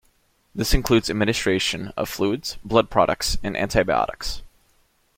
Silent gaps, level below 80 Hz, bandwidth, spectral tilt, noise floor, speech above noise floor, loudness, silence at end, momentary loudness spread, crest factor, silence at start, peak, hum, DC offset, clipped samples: none; -34 dBFS; 16.5 kHz; -4.5 dB/octave; -63 dBFS; 41 dB; -22 LUFS; 0.7 s; 9 LU; 20 dB; 0.55 s; -2 dBFS; none; under 0.1%; under 0.1%